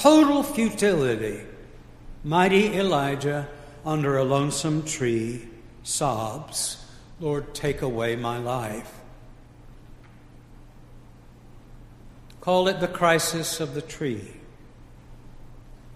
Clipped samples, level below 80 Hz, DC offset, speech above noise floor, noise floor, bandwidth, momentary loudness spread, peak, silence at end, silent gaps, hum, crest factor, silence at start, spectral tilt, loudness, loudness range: under 0.1%; -48 dBFS; under 0.1%; 24 dB; -48 dBFS; 15.5 kHz; 16 LU; -2 dBFS; 0 s; none; none; 24 dB; 0 s; -4.5 dB/octave; -24 LUFS; 8 LU